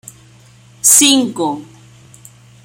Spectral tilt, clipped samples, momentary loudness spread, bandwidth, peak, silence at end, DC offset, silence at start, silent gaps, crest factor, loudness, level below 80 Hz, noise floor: -1 dB/octave; under 0.1%; 14 LU; over 20 kHz; 0 dBFS; 1 s; under 0.1%; 0.85 s; none; 16 dB; -10 LUFS; -58 dBFS; -44 dBFS